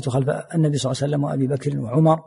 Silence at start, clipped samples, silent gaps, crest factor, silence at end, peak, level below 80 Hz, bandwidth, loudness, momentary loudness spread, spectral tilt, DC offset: 0 s; under 0.1%; none; 14 dB; 0.05 s; -6 dBFS; -56 dBFS; 11.5 kHz; -22 LUFS; 4 LU; -7 dB/octave; under 0.1%